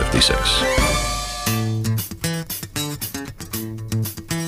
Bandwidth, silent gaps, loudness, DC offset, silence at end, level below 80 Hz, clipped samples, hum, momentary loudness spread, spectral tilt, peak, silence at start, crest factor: 16 kHz; none; -21 LUFS; under 0.1%; 0 s; -30 dBFS; under 0.1%; none; 12 LU; -3.5 dB/octave; -2 dBFS; 0 s; 20 dB